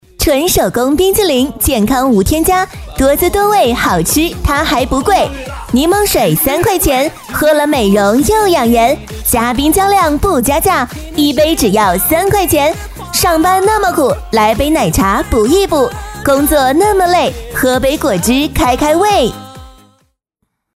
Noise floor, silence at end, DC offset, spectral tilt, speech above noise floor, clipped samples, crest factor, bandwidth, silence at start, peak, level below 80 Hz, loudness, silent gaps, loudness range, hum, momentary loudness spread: -69 dBFS; 1.05 s; under 0.1%; -4 dB/octave; 58 dB; under 0.1%; 12 dB; 16.5 kHz; 0.2 s; 0 dBFS; -26 dBFS; -11 LUFS; none; 1 LU; none; 4 LU